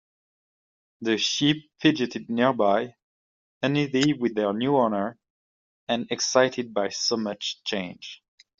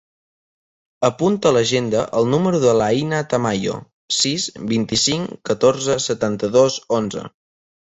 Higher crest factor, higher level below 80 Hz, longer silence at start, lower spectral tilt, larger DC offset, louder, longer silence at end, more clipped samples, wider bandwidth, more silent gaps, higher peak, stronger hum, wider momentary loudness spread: about the same, 22 dB vs 18 dB; second, -68 dBFS vs -52 dBFS; about the same, 1 s vs 1 s; about the same, -3.5 dB/octave vs -4.5 dB/octave; neither; second, -25 LUFS vs -18 LUFS; about the same, 0.45 s vs 0.55 s; neither; about the same, 7.8 kHz vs 8.4 kHz; first, 3.03-3.61 s, 5.30-5.87 s vs 3.93-4.08 s; about the same, -4 dBFS vs -2 dBFS; neither; about the same, 10 LU vs 8 LU